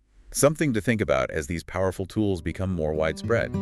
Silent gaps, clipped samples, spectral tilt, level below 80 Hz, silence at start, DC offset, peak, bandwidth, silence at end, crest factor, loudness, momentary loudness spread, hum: none; under 0.1%; -5.5 dB/octave; -46 dBFS; 0.3 s; under 0.1%; -6 dBFS; 13.5 kHz; 0 s; 20 dB; -26 LUFS; 7 LU; none